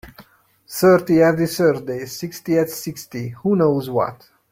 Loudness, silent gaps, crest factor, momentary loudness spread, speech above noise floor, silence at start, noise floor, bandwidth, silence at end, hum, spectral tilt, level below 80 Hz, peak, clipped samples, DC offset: -19 LUFS; none; 16 dB; 14 LU; 33 dB; 0.05 s; -51 dBFS; 16.5 kHz; 0.4 s; none; -6 dB/octave; -56 dBFS; -2 dBFS; under 0.1%; under 0.1%